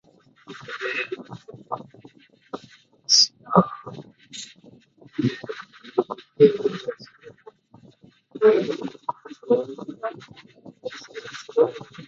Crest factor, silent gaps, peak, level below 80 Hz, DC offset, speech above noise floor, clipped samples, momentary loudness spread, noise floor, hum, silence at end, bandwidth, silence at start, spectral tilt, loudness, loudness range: 26 dB; none; 0 dBFS; -66 dBFS; under 0.1%; 20 dB; under 0.1%; 23 LU; -54 dBFS; none; 0 s; 7.8 kHz; 0.5 s; -3.5 dB/octave; -23 LUFS; 4 LU